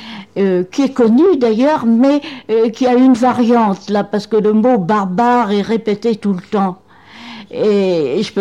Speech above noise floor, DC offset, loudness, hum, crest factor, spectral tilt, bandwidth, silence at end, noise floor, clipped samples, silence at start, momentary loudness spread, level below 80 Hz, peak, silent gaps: 23 dB; 0.2%; -14 LUFS; none; 12 dB; -7 dB/octave; 10 kHz; 0 s; -36 dBFS; under 0.1%; 0 s; 7 LU; -58 dBFS; -2 dBFS; none